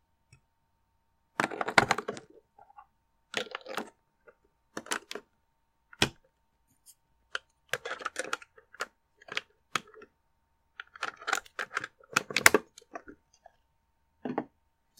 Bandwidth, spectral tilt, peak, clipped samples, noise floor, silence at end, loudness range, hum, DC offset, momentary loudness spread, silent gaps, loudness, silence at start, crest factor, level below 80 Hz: 16.5 kHz; -2 dB/octave; 0 dBFS; under 0.1%; -75 dBFS; 0.55 s; 10 LU; none; under 0.1%; 22 LU; none; -32 LUFS; 1.4 s; 36 dB; -66 dBFS